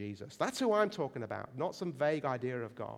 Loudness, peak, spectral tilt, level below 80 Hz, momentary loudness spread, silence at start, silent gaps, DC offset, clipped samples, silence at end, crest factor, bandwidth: -35 LUFS; -16 dBFS; -5.5 dB/octave; -76 dBFS; 10 LU; 0 s; none; under 0.1%; under 0.1%; 0 s; 18 dB; 15.5 kHz